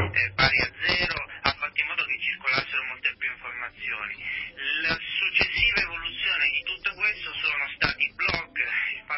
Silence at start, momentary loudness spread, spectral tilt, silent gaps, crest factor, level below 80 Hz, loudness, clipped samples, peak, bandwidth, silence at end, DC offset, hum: 0 s; 10 LU; -6.5 dB/octave; none; 24 dB; -48 dBFS; -25 LUFS; under 0.1%; -4 dBFS; 6 kHz; 0 s; under 0.1%; none